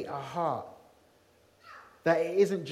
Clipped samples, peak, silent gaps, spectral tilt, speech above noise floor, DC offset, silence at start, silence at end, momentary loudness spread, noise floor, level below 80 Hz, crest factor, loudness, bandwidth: under 0.1%; -12 dBFS; none; -6 dB/octave; 35 dB; under 0.1%; 0 s; 0 s; 24 LU; -64 dBFS; -74 dBFS; 20 dB; -30 LUFS; 14 kHz